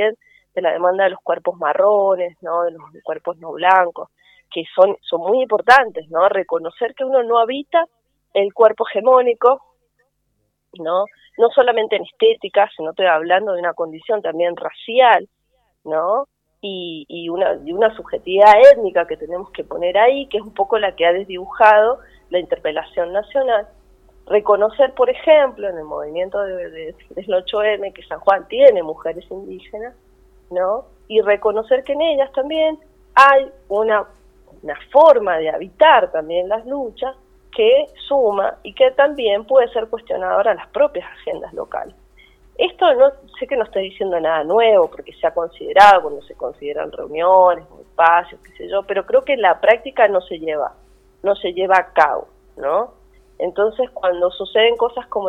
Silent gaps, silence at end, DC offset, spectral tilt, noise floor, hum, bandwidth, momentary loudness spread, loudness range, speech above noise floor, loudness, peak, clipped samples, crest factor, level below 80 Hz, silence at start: none; 0 s; under 0.1%; -4.5 dB/octave; -69 dBFS; none; 8.4 kHz; 16 LU; 5 LU; 53 dB; -16 LUFS; 0 dBFS; under 0.1%; 16 dB; -54 dBFS; 0 s